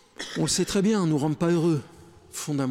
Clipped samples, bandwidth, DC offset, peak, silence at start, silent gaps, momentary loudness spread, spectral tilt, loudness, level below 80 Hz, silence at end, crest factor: under 0.1%; 16 kHz; under 0.1%; -14 dBFS; 0.2 s; none; 11 LU; -5 dB/octave; -25 LUFS; -54 dBFS; 0 s; 12 dB